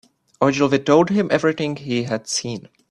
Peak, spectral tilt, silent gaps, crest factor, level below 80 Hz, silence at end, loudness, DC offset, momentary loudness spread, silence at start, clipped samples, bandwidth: -2 dBFS; -5 dB/octave; none; 18 dB; -58 dBFS; 0.3 s; -19 LUFS; under 0.1%; 9 LU; 0.4 s; under 0.1%; 12 kHz